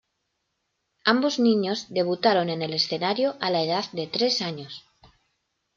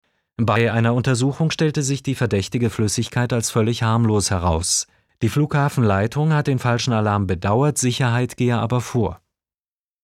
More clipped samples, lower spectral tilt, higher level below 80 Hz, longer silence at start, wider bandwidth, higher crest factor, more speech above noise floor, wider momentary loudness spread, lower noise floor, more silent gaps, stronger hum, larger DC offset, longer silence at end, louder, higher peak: neither; about the same, -4.5 dB/octave vs -5 dB/octave; second, -72 dBFS vs -44 dBFS; first, 1.05 s vs 0.4 s; second, 7.4 kHz vs 14 kHz; about the same, 20 dB vs 16 dB; second, 53 dB vs over 71 dB; first, 7 LU vs 4 LU; second, -77 dBFS vs under -90 dBFS; neither; neither; neither; about the same, 0.95 s vs 0.9 s; second, -24 LUFS vs -20 LUFS; about the same, -6 dBFS vs -4 dBFS